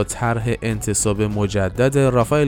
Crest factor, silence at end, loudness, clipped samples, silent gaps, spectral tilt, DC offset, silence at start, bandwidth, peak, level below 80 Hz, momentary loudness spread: 16 dB; 0 s; -19 LUFS; under 0.1%; none; -5.5 dB/octave; under 0.1%; 0 s; 18 kHz; -2 dBFS; -36 dBFS; 5 LU